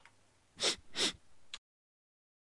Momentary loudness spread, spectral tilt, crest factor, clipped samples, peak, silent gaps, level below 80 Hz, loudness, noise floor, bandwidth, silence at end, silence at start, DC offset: 17 LU; -0.5 dB/octave; 22 dB; under 0.1%; -20 dBFS; none; -70 dBFS; -34 LUFS; -68 dBFS; 11.5 kHz; 1 s; 0.55 s; under 0.1%